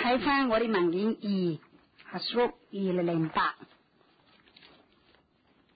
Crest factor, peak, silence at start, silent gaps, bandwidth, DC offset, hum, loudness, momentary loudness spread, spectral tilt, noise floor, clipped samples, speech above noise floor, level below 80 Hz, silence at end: 16 dB; -16 dBFS; 0 s; none; 5 kHz; under 0.1%; none; -29 LUFS; 10 LU; -10 dB/octave; -67 dBFS; under 0.1%; 38 dB; -64 dBFS; 2.1 s